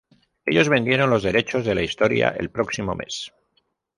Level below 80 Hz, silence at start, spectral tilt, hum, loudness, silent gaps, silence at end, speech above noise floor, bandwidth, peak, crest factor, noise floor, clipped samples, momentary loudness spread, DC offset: -48 dBFS; 0.45 s; -5 dB/octave; none; -21 LUFS; none; 0.7 s; 48 dB; 11.5 kHz; -4 dBFS; 20 dB; -69 dBFS; under 0.1%; 12 LU; under 0.1%